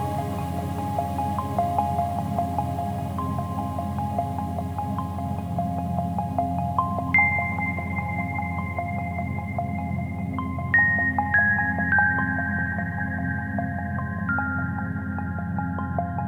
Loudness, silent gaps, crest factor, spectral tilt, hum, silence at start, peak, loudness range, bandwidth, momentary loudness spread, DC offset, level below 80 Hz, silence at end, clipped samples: -25 LUFS; none; 18 dB; -8 dB/octave; none; 0 s; -8 dBFS; 6 LU; over 20 kHz; 9 LU; under 0.1%; -44 dBFS; 0 s; under 0.1%